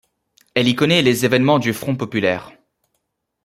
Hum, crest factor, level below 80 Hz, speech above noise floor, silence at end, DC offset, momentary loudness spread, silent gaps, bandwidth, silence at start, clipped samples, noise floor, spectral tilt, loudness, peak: none; 18 dB; -58 dBFS; 56 dB; 0.95 s; under 0.1%; 8 LU; none; 16 kHz; 0.55 s; under 0.1%; -73 dBFS; -5 dB/octave; -17 LUFS; -2 dBFS